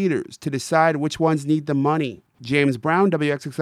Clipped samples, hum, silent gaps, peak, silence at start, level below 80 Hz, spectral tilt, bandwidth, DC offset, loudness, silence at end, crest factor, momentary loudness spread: under 0.1%; none; none; -4 dBFS; 0 s; -62 dBFS; -6 dB/octave; 14 kHz; under 0.1%; -21 LUFS; 0 s; 16 dB; 9 LU